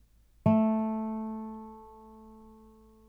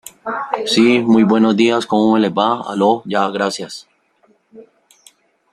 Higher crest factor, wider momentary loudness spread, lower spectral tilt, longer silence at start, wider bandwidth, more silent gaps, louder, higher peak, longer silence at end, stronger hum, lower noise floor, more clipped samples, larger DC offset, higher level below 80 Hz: first, 20 dB vs 14 dB; first, 26 LU vs 13 LU; first, -10.5 dB/octave vs -5 dB/octave; first, 0.45 s vs 0.25 s; second, 3.3 kHz vs 13 kHz; neither; second, -30 LUFS vs -15 LUFS; second, -12 dBFS vs -2 dBFS; second, 0.55 s vs 0.9 s; neither; about the same, -56 dBFS vs -57 dBFS; neither; neither; about the same, -60 dBFS vs -60 dBFS